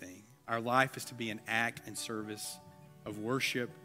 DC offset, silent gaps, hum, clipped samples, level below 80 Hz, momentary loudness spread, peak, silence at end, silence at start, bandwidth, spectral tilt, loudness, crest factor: under 0.1%; none; none; under 0.1%; -76 dBFS; 18 LU; -12 dBFS; 0 s; 0 s; 16 kHz; -3.5 dB/octave; -35 LUFS; 26 dB